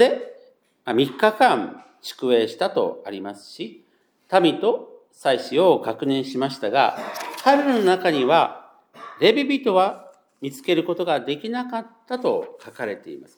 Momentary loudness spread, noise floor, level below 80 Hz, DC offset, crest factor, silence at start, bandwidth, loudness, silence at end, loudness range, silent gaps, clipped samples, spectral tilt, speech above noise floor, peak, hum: 17 LU; -54 dBFS; -84 dBFS; under 0.1%; 20 dB; 0 s; over 20 kHz; -21 LUFS; 0.15 s; 4 LU; none; under 0.1%; -5 dB/octave; 33 dB; -2 dBFS; none